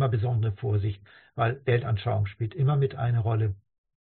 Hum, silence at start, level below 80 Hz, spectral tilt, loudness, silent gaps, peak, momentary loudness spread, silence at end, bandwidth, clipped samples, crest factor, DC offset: none; 0 s; -54 dBFS; -7 dB/octave; -27 LUFS; none; -12 dBFS; 7 LU; 0.6 s; 4.3 kHz; under 0.1%; 14 dB; under 0.1%